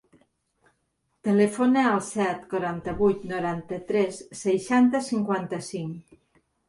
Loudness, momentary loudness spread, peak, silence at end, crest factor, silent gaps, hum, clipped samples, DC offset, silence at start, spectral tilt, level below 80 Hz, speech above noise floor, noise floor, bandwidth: -25 LUFS; 12 LU; -10 dBFS; 0.65 s; 16 dB; none; none; under 0.1%; under 0.1%; 1.25 s; -6 dB/octave; -58 dBFS; 50 dB; -74 dBFS; 11.5 kHz